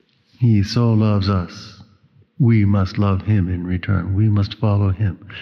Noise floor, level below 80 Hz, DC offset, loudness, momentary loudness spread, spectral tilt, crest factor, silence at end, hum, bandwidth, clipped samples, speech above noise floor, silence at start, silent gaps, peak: -53 dBFS; -48 dBFS; under 0.1%; -18 LUFS; 7 LU; -8.5 dB/octave; 12 dB; 0 s; none; 6.4 kHz; under 0.1%; 37 dB; 0.4 s; none; -6 dBFS